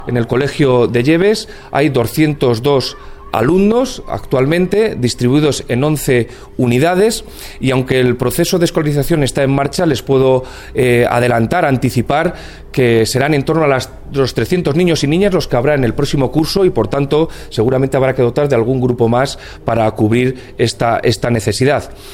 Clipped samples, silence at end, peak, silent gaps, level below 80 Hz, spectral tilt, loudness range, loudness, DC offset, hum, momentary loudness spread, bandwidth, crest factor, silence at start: under 0.1%; 0 s; 0 dBFS; none; -34 dBFS; -6 dB/octave; 1 LU; -14 LUFS; under 0.1%; none; 6 LU; 17.5 kHz; 14 dB; 0 s